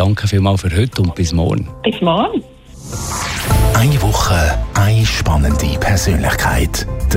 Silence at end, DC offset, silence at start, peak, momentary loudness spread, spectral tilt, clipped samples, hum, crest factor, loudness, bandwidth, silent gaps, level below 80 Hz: 0 s; under 0.1%; 0 s; -2 dBFS; 7 LU; -5 dB/octave; under 0.1%; none; 12 dB; -15 LUFS; 16.5 kHz; none; -22 dBFS